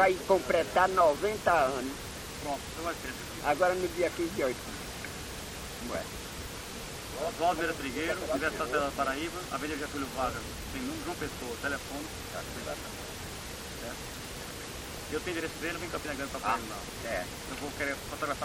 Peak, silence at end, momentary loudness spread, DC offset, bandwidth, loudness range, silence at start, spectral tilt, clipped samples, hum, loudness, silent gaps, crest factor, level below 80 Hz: -10 dBFS; 0 s; 13 LU; under 0.1%; 17 kHz; 8 LU; 0 s; -3.5 dB/octave; under 0.1%; none; -33 LUFS; none; 22 dB; -50 dBFS